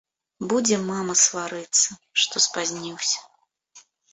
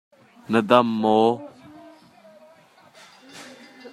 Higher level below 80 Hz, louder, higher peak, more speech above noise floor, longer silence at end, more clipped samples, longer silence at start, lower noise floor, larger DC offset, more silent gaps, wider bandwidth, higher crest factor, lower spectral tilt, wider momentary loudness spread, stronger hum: about the same, -68 dBFS vs -72 dBFS; about the same, -22 LUFS vs -20 LUFS; about the same, -4 dBFS vs -2 dBFS; about the same, 31 dB vs 34 dB; first, 0.35 s vs 0.05 s; neither; about the same, 0.4 s vs 0.5 s; about the same, -54 dBFS vs -53 dBFS; neither; neither; second, 8.4 kHz vs 12.5 kHz; about the same, 20 dB vs 22 dB; second, -1.5 dB/octave vs -6 dB/octave; second, 10 LU vs 26 LU; neither